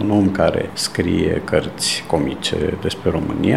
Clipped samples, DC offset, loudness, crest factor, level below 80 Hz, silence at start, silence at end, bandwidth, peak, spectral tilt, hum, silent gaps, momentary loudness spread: under 0.1%; 0.5%; -19 LUFS; 18 dB; -38 dBFS; 0 s; 0 s; 15.5 kHz; -2 dBFS; -5 dB/octave; none; none; 4 LU